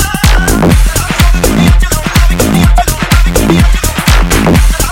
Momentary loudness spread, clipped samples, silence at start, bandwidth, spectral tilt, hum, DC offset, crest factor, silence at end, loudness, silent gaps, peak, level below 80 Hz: 2 LU; 0.7%; 0 s; 17 kHz; -4.5 dB/octave; none; under 0.1%; 6 dB; 0 s; -9 LUFS; none; 0 dBFS; -10 dBFS